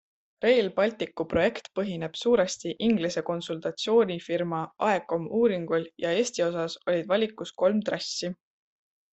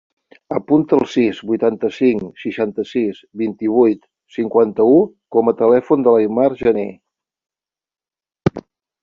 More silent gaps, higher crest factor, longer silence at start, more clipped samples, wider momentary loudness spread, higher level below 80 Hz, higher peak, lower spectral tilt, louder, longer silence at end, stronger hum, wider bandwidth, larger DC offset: neither; about the same, 16 dB vs 16 dB; about the same, 0.4 s vs 0.5 s; neither; second, 8 LU vs 11 LU; second, -62 dBFS vs -52 dBFS; second, -10 dBFS vs -2 dBFS; second, -4.5 dB/octave vs -8 dB/octave; second, -27 LUFS vs -17 LUFS; first, 0.8 s vs 0.4 s; neither; first, 8.4 kHz vs 7.2 kHz; neither